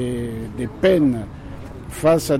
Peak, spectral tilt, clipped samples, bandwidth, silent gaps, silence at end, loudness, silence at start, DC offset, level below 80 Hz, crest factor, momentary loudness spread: -6 dBFS; -6.5 dB/octave; under 0.1%; 16 kHz; none; 0 s; -20 LUFS; 0 s; under 0.1%; -40 dBFS; 14 dB; 19 LU